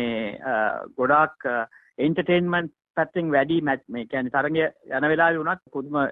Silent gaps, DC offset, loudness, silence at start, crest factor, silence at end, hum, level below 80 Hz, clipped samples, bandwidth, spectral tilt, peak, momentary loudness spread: 2.90-2.94 s; under 0.1%; -24 LUFS; 0 s; 18 dB; 0 s; none; -62 dBFS; under 0.1%; 4.5 kHz; -9.5 dB/octave; -6 dBFS; 9 LU